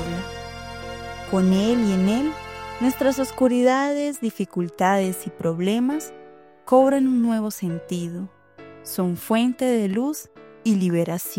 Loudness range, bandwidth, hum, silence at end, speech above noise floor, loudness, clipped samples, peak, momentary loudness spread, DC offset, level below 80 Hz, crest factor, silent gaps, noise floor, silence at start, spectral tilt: 3 LU; 16.5 kHz; none; 0 s; 24 dB; -22 LUFS; under 0.1%; -4 dBFS; 15 LU; under 0.1%; -52 dBFS; 18 dB; none; -45 dBFS; 0 s; -6 dB/octave